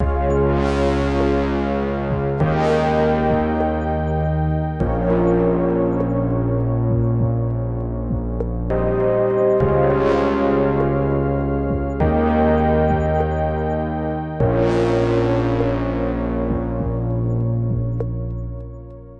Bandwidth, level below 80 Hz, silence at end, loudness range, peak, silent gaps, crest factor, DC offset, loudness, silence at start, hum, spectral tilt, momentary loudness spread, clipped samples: 8 kHz; -30 dBFS; 0 s; 3 LU; -4 dBFS; none; 14 dB; under 0.1%; -20 LUFS; 0 s; none; -9 dB/octave; 7 LU; under 0.1%